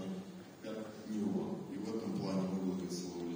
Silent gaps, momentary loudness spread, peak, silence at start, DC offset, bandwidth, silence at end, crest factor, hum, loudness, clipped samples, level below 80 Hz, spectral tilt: none; 9 LU; -26 dBFS; 0 s; under 0.1%; over 20 kHz; 0 s; 14 dB; none; -40 LUFS; under 0.1%; -78 dBFS; -6.5 dB/octave